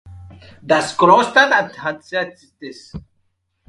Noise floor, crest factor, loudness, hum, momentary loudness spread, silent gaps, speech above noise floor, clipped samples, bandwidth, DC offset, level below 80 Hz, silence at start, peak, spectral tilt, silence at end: -67 dBFS; 18 dB; -15 LUFS; none; 24 LU; none; 50 dB; under 0.1%; 11.5 kHz; under 0.1%; -50 dBFS; 0.05 s; 0 dBFS; -4 dB/octave; 0.7 s